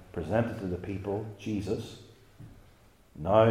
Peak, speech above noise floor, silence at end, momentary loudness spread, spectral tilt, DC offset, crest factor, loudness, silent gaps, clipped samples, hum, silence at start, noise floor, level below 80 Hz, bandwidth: -8 dBFS; 30 dB; 0 s; 25 LU; -7.5 dB/octave; under 0.1%; 22 dB; -32 LUFS; none; under 0.1%; none; 0 s; -59 dBFS; -58 dBFS; 14.5 kHz